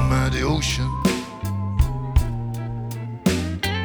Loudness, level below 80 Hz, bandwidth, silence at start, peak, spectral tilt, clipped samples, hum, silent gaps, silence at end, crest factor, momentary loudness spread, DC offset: -24 LUFS; -28 dBFS; over 20 kHz; 0 s; -4 dBFS; -5.5 dB/octave; under 0.1%; none; none; 0 s; 18 dB; 8 LU; under 0.1%